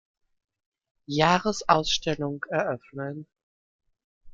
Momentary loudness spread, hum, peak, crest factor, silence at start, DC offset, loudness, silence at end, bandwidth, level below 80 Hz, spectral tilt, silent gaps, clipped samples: 14 LU; none; -2 dBFS; 26 dB; 1.1 s; under 0.1%; -26 LUFS; 0 s; 9 kHz; -54 dBFS; -4 dB/octave; 3.43-3.79 s, 4.04-4.21 s; under 0.1%